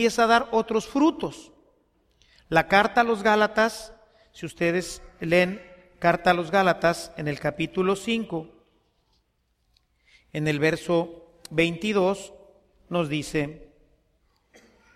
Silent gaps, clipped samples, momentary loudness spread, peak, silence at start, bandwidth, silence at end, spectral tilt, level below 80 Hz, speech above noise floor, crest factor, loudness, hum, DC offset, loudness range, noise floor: none; under 0.1%; 16 LU; -4 dBFS; 0 s; 15 kHz; 1.3 s; -5 dB/octave; -54 dBFS; 47 dB; 22 dB; -24 LUFS; none; under 0.1%; 6 LU; -71 dBFS